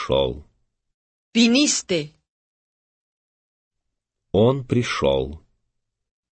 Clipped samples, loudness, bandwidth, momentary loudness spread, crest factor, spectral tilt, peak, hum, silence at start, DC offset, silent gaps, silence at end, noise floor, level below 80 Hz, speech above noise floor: under 0.1%; -20 LUFS; 8.8 kHz; 12 LU; 20 dB; -4.5 dB/octave; -4 dBFS; none; 0 s; under 0.1%; 0.94-1.32 s, 2.29-3.71 s; 1 s; -79 dBFS; -46 dBFS; 60 dB